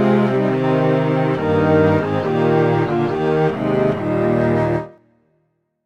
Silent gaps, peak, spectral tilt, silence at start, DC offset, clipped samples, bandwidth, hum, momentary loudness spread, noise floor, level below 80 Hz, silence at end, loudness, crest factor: none; -4 dBFS; -9 dB/octave; 0 s; under 0.1%; under 0.1%; 8.4 kHz; none; 4 LU; -67 dBFS; -48 dBFS; 0.95 s; -17 LUFS; 14 dB